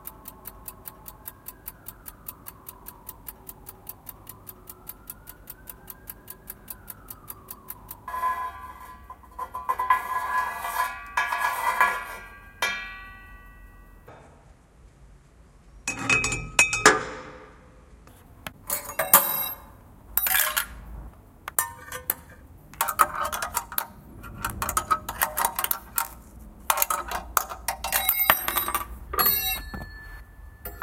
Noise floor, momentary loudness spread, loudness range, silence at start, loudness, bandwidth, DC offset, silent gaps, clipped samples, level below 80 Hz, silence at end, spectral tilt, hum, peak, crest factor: -53 dBFS; 22 LU; 17 LU; 0 s; -25 LUFS; 17 kHz; under 0.1%; none; under 0.1%; -48 dBFS; 0 s; -1 dB/octave; none; 0 dBFS; 30 dB